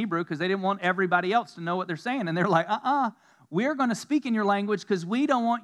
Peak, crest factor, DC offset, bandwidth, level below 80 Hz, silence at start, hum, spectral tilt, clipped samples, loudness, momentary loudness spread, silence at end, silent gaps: -8 dBFS; 18 dB; under 0.1%; 12.5 kHz; -90 dBFS; 0 s; none; -6 dB/octave; under 0.1%; -26 LUFS; 6 LU; 0 s; none